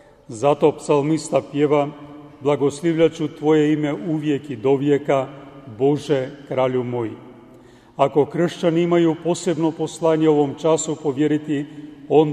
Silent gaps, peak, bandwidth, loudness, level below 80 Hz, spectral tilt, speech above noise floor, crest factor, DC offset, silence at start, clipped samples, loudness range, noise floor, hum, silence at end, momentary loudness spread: none; -2 dBFS; 11 kHz; -20 LUFS; -60 dBFS; -6.5 dB/octave; 27 dB; 18 dB; under 0.1%; 0.3 s; under 0.1%; 3 LU; -47 dBFS; none; 0 s; 10 LU